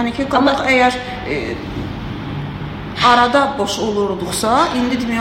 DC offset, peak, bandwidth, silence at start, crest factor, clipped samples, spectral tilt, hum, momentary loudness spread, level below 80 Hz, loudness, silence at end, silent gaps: under 0.1%; 0 dBFS; 16.5 kHz; 0 s; 16 dB; under 0.1%; -4.5 dB/octave; none; 13 LU; -38 dBFS; -17 LUFS; 0 s; none